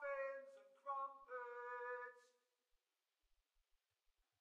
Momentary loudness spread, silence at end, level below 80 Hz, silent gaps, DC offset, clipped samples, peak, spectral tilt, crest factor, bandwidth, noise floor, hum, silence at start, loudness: 9 LU; 2.15 s; under -90 dBFS; none; under 0.1%; under 0.1%; -36 dBFS; -2 dB/octave; 18 dB; 9.4 kHz; under -90 dBFS; none; 0 s; -51 LUFS